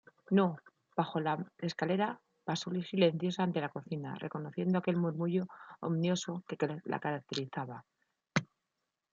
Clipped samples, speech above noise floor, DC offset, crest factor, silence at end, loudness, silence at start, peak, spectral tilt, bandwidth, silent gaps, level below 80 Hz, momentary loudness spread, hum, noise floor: under 0.1%; 53 dB; under 0.1%; 20 dB; 0.7 s; -35 LUFS; 0.3 s; -14 dBFS; -6 dB/octave; 7.6 kHz; none; -78 dBFS; 10 LU; none; -87 dBFS